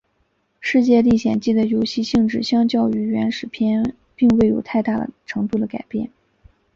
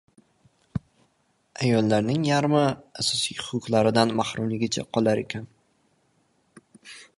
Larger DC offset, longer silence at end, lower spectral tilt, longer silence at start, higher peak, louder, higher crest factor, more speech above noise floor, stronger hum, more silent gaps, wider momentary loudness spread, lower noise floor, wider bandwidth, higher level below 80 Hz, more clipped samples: neither; first, 0.7 s vs 0.15 s; first, -6.5 dB/octave vs -5 dB/octave; second, 0.6 s vs 0.75 s; about the same, -4 dBFS vs -4 dBFS; first, -19 LUFS vs -24 LUFS; second, 14 dB vs 22 dB; first, 48 dB vs 44 dB; neither; neither; second, 11 LU vs 15 LU; about the same, -66 dBFS vs -68 dBFS; second, 7.4 kHz vs 11.5 kHz; first, -48 dBFS vs -58 dBFS; neither